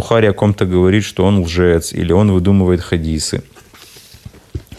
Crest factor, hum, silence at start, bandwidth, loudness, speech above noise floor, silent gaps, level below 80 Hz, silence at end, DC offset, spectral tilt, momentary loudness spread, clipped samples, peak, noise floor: 14 dB; none; 0 s; 13.5 kHz; -14 LUFS; 28 dB; none; -36 dBFS; 0 s; under 0.1%; -6.5 dB/octave; 8 LU; under 0.1%; 0 dBFS; -41 dBFS